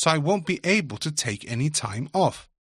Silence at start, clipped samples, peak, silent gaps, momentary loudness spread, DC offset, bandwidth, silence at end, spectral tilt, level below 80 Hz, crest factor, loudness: 0 s; under 0.1%; -4 dBFS; none; 5 LU; under 0.1%; 13.5 kHz; 0.35 s; -4 dB/octave; -60 dBFS; 22 dB; -25 LUFS